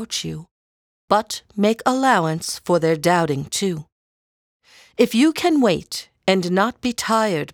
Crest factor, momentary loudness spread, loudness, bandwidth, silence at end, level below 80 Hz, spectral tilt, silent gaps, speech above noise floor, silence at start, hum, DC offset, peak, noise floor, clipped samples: 20 dB; 9 LU; -20 LUFS; over 20 kHz; 0.05 s; -58 dBFS; -4.5 dB/octave; 0.51-1.08 s, 3.92-4.60 s; over 71 dB; 0 s; none; under 0.1%; -2 dBFS; under -90 dBFS; under 0.1%